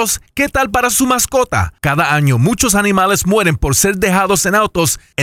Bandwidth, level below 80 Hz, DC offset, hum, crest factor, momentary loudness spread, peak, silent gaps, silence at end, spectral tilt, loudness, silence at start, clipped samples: 17 kHz; -32 dBFS; under 0.1%; none; 12 dB; 4 LU; -2 dBFS; none; 0 s; -4 dB/octave; -13 LUFS; 0 s; under 0.1%